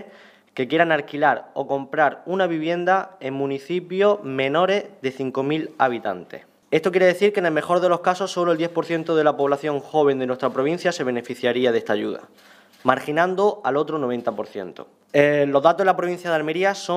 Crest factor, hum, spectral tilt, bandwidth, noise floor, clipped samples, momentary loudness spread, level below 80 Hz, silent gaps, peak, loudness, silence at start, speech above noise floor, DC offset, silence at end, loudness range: 20 dB; none; -5.5 dB/octave; 14.5 kHz; -49 dBFS; under 0.1%; 9 LU; -74 dBFS; none; 0 dBFS; -21 LUFS; 0 s; 28 dB; under 0.1%; 0 s; 2 LU